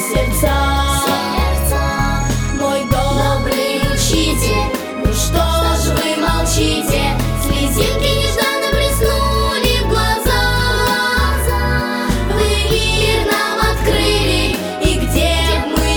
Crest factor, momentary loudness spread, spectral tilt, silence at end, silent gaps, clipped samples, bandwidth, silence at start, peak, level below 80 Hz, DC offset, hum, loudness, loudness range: 14 dB; 3 LU; -4 dB/octave; 0 s; none; under 0.1%; over 20 kHz; 0 s; -2 dBFS; -20 dBFS; under 0.1%; none; -15 LUFS; 1 LU